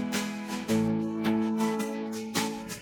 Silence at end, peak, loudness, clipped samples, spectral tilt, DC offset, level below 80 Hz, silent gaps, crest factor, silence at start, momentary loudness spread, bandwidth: 0 s; -14 dBFS; -30 LUFS; under 0.1%; -4.5 dB/octave; under 0.1%; -62 dBFS; none; 16 dB; 0 s; 6 LU; 19 kHz